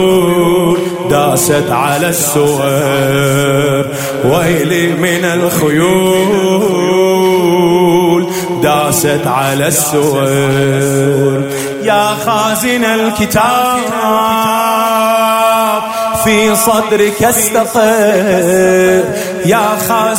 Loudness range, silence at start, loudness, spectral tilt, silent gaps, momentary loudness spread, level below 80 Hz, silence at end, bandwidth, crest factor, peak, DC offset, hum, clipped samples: 2 LU; 0 s; -11 LUFS; -4.5 dB/octave; none; 4 LU; -44 dBFS; 0 s; 16.5 kHz; 10 dB; 0 dBFS; under 0.1%; none; under 0.1%